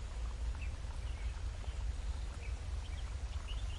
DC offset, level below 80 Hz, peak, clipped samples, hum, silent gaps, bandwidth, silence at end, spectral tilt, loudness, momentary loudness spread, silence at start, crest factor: under 0.1%; -40 dBFS; -28 dBFS; under 0.1%; none; none; 11 kHz; 0 s; -5 dB/octave; -44 LUFS; 2 LU; 0 s; 12 dB